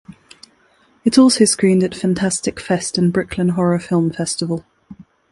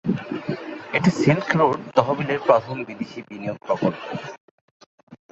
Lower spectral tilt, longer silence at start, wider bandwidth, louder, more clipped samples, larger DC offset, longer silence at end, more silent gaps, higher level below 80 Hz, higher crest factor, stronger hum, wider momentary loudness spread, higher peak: second, -5 dB/octave vs -7 dB/octave; about the same, 0.1 s vs 0.05 s; first, 11.5 kHz vs 8 kHz; first, -17 LUFS vs -23 LUFS; neither; neither; first, 0.3 s vs 0.15 s; second, none vs 4.40-4.80 s, 4.86-5.07 s; first, -50 dBFS vs -60 dBFS; about the same, 18 dB vs 22 dB; neither; second, 10 LU vs 14 LU; about the same, 0 dBFS vs -2 dBFS